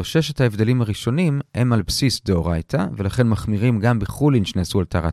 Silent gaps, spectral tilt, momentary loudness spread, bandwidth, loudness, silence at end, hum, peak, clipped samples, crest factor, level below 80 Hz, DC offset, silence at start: none; -6 dB/octave; 4 LU; 14 kHz; -20 LUFS; 0 s; none; -2 dBFS; under 0.1%; 18 dB; -38 dBFS; under 0.1%; 0 s